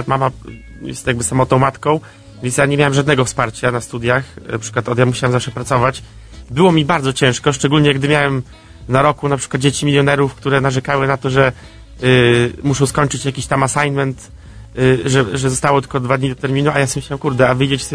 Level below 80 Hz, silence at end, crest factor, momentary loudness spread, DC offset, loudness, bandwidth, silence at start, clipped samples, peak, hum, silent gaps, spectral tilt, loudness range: -40 dBFS; 0 s; 16 dB; 8 LU; under 0.1%; -15 LUFS; 11 kHz; 0 s; under 0.1%; 0 dBFS; none; none; -5 dB/octave; 2 LU